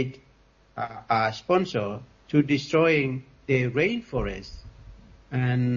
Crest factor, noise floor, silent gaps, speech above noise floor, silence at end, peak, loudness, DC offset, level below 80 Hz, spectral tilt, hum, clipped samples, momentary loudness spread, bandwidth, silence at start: 18 dB; -59 dBFS; none; 34 dB; 0 s; -8 dBFS; -26 LUFS; under 0.1%; -48 dBFS; -7 dB/octave; none; under 0.1%; 15 LU; 7.4 kHz; 0 s